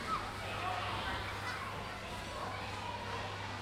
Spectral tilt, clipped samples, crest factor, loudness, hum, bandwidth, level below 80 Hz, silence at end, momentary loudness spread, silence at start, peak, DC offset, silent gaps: -4 dB/octave; under 0.1%; 16 dB; -40 LUFS; none; 16.5 kHz; -54 dBFS; 0 s; 5 LU; 0 s; -24 dBFS; under 0.1%; none